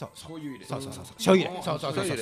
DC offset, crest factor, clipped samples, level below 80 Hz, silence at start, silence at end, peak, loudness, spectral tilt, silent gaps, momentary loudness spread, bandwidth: under 0.1%; 22 dB; under 0.1%; -62 dBFS; 0 s; 0 s; -6 dBFS; -27 LUFS; -5 dB/octave; none; 17 LU; 15.5 kHz